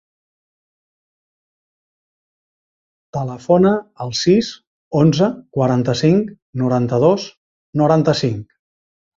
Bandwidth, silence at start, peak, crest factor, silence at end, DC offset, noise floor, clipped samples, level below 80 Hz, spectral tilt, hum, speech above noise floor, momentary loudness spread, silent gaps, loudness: 7.8 kHz; 3.15 s; -2 dBFS; 18 dB; 0.75 s; under 0.1%; under -90 dBFS; under 0.1%; -54 dBFS; -6.5 dB/octave; none; over 74 dB; 12 LU; 4.67-4.91 s, 6.42-6.53 s, 7.37-7.73 s; -17 LUFS